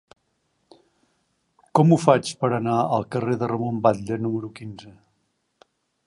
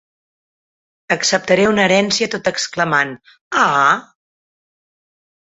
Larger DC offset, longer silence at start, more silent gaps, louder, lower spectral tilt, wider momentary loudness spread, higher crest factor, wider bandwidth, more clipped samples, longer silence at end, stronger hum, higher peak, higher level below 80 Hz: neither; first, 1.75 s vs 1.1 s; second, none vs 3.41-3.51 s; second, -22 LUFS vs -15 LUFS; first, -7 dB/octave vs -3 dB/octave; first, 17 LU vs 8 LU; about the same, 22 dB vs 18 dB; first, 11.5 kHz vs 8.4 kHz; neither; second, 1.15 s vs 1.4 s; neither; about the same, -2 dBFS vs -2 dBFS; about the same, -62 dBFS vs -58 dBFS